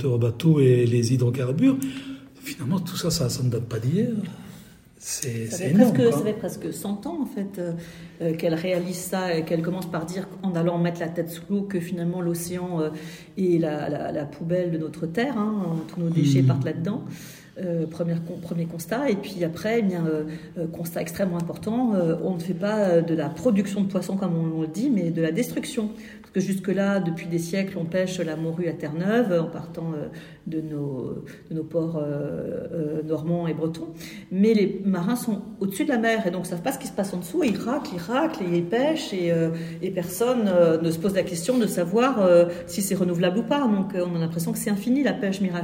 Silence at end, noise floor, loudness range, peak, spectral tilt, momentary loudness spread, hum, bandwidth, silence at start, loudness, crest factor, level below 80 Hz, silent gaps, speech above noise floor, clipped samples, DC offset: 0 s; -47 dBFS; 5 LU; -2 dBFS; -6.5 dB/octave; 11 LU; none; 16 kHz; 0 s; -25 LUFS; 22 dB; -60 dBFS; none; 23 dB; under 0.1%; under 0.1%